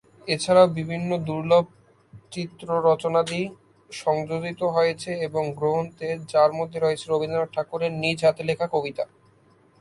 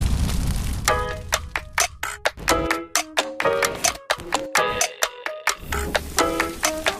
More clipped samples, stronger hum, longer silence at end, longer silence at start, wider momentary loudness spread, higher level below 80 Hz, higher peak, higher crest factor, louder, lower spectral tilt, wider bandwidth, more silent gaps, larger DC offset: neither; neither; first, 0.75 s vs 0 s; first, 0.25 s vs 0 s; first, 11 LU vs 5 LU; second, -62 dBFS vs -32 dBFS; about the same, -4 dBFS vs -2 dBFS; about the same, 20 dB vs 22 dB; about the same, -24 LUFS vs -23 LUFS; first, -5.5 dB/octave vs -2.5 dB/octave; second, 11.5 kHz vs 15.5 kHz; neither; neither